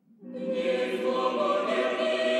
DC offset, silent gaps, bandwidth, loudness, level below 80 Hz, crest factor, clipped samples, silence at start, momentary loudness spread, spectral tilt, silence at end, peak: under 0.1%; none; 12 kHz; -28 LUFS; -82 dBFS; 14 dB; under 0.1%; 0.2 s; 7 LU; -4.5 dB/octave; 0 s; -14 dBFS